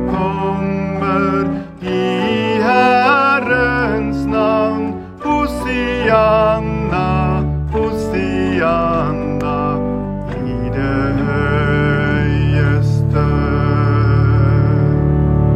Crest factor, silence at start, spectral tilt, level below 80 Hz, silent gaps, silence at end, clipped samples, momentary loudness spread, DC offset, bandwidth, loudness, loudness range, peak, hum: 14 dB; 0 s; -8 dB/octave; -28 dBFS; none; 0 s; under 0.1%; 7 LU; under 0.1%; 11 kHz; -15 LUFS; 3 LU; 0 dBFS; none